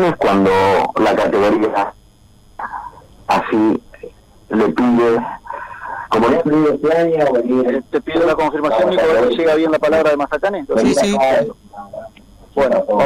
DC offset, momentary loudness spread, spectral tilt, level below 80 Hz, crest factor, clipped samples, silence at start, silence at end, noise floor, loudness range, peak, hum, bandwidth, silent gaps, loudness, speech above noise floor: under 0.1%; 15 LU; -6 dB/octave; -46 dBFS; 10 dB; under 0.1%; 0 s; 0 s; -47 dBFS; 4 LU; -4 dBFS; none; 15 kHz; none; -15 LUFS; 33 dB